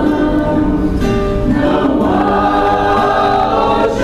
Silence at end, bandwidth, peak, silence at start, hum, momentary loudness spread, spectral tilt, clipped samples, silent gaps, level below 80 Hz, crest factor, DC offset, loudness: 0 s; 13 kHz; -2 dBFS; 0 s; none; 3 LU; -7 dB/octave; under 0.1%; none; -24 dBFS; 10 dB; 0.3%; -13 LUFS